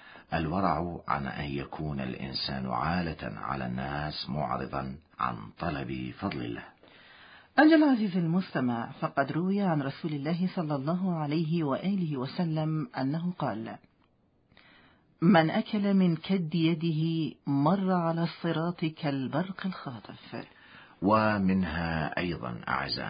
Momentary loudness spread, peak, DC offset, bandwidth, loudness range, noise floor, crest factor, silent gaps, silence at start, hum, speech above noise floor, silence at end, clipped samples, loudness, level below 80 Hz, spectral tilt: 11 LU; -8 dBFS; under 0.1%; 5.2 kHz; 7 LU; -68 dBFS; 22 dB; none; 0 s; none; 39 dB; 0 s; under 0.1%; -30 LUFS; -54 dBFS; -11 dB/octave